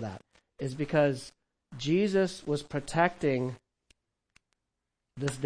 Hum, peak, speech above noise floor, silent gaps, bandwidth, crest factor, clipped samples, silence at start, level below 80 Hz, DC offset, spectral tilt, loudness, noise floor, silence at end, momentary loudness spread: none; -10 dBFS; 55 dB; none; 10.5 kHz; 22 dB; under 0.1%; 0 s; -60 dBFS; under 0.1%; -6 dB/octave; -30 LUFS; -85 dBFS; 0 s; 18 LU